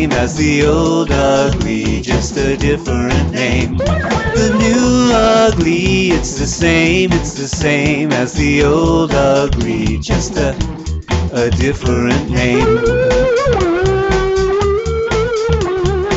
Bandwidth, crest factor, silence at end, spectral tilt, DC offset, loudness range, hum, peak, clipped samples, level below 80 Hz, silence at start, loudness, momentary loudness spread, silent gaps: 8.2 kHz; 10 dB; 0 s; -5.5 dB/octave; under 0.1%; 3 LU; none; -2 dBFS; under 0.1%; -24 dBFS; 0 s; -14 LUFS; 6 LU; none